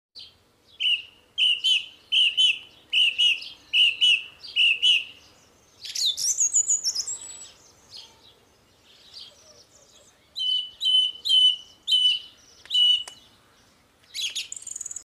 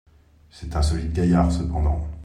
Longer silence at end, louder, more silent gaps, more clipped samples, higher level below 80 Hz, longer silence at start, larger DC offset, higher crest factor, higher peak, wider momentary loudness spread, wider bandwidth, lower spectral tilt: about the same, 0.05 s vs 0 s; about the same, -21 LUFS vs -23 LUFS; neither; neither; second, -72 dBFS vs -28 dBFS; second, 0.15 s vs 0.55 s; neither; about the same, 16 dB vs 16 dB; about the same, -10 dBFS vs -8 dBFS; first, 16 LU vs 9 LU; first, 15.5 kHz vs 10.5 kHz; second, 4.5 dB/octave vs -7.5 dB/octave